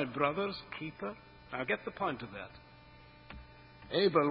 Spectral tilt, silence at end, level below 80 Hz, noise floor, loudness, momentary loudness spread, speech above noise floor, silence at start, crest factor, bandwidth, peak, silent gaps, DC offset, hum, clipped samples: -3.5 dB/octave; 0 s; -62 dBFS; -57 dBFS; -35 LUFS; 25 LU; 22 dB; 0 s; 22 dB; 5.4 kHz; -14 dBFS; none; under 0.1%; none; under 0.1%